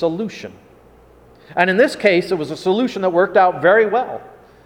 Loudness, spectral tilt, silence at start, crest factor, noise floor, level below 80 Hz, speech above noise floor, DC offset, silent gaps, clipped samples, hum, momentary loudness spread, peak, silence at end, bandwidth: -16 LUFS; -5.5 dB/octave; 0 s; 18 dB; -47 dBFS; -56 dBFS; 31 dB; under 0.1%; none; under 0.1%; none; 14 LU; 0 dBFS; 0.35 s; 16 kHz